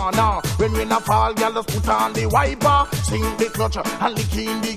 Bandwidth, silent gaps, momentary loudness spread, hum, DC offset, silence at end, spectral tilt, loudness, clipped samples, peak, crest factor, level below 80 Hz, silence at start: 16 kHz; none; 5 LU; none; under 0.1%; 0 s; -5 dB/octave; -20 LUFS; under 0.1%; -4 dBFS; 16 dB; -30 dBFS; 0 s